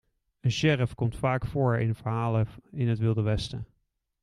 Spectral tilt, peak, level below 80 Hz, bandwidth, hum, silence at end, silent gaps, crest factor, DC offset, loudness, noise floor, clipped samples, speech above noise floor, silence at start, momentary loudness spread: -7 dB/octave; -10 dBFS; -48 dBFS; 11 kHz; none; 0.6 s; none; 18 dB; under 0.1%; -28 LUFS; -75 dBFS; under 0.1%; 49 dB; 0.45 s; 8 LU